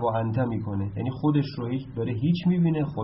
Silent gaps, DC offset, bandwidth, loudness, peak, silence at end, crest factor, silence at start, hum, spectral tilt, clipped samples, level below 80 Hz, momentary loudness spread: none; under 0.1%; 5.8 kHz; -26 LUFS; -10 dBFS; 0 s; 14 dB; 0 s; none; -8 dB/octave; under 0.1%; -54 dBFS; 7 LU